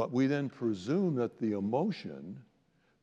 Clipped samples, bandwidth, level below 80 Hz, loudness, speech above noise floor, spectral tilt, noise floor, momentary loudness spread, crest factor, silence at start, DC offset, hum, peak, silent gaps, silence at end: under 0.1%; 8.4 kHz; -82 dBFS; -33 LUFS; 39 dB; -8 dB/octave; -71 dBFS; 15 LU; 14 dB; 0 s; under 0.1%; none; -18 dBFS; none; 0.6 s